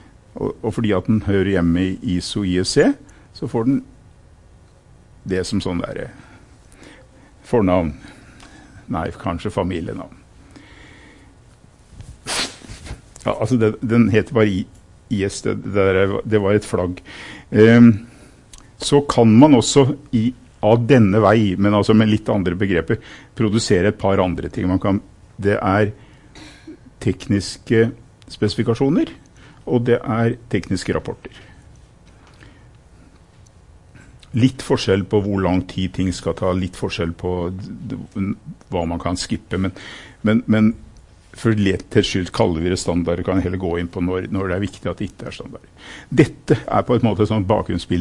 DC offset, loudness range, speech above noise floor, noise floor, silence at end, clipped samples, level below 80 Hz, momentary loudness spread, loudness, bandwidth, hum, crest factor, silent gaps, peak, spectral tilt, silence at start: under 0.1%; 13 LU; 30 dB; -48 dBFS; 0 s; under 0.1%; -44 dBFS; 16 LU; -19 LUFS; 11.5 kHz; none; 20 dB; none; 0 dBFS; -6.5 dB/octave; 0.35 s